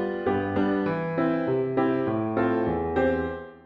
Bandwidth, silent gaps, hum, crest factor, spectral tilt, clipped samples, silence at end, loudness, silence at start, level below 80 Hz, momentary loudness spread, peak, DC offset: 5.6 kHz; none; none; 14 dB; -9.5 dB/octave; under 0.1%; 0.05 s; -26 LUFS; 0 s; -50 dBFS; 2 LU; -12 dBFS; under 0.1%